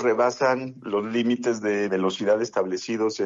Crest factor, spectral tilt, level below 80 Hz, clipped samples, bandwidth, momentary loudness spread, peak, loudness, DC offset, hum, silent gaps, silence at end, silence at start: 16 dB; -5 dB/octave; -72 dBFS; under 0.1%; 7.8 kHz; 6 LU; -8 dBFS; -24 LUFS; under 0.1%; none; none; 0 s; 0 s